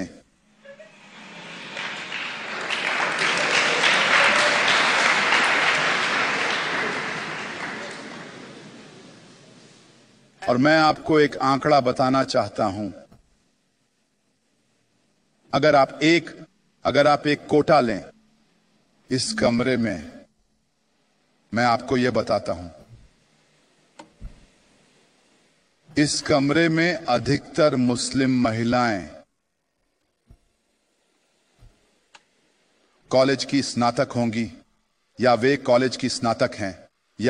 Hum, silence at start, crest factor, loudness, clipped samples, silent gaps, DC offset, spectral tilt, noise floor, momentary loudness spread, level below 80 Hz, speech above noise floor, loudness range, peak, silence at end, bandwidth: none; 0 s; 20 dB; -21 LUFS; under 0.1%; none; under 0.1%; -4 dB/octave; -75 dBFS; 15 LU; -56 dBFS; 54 dB; 11 LU; -4 dBFS; 0 s; 10.5 kHz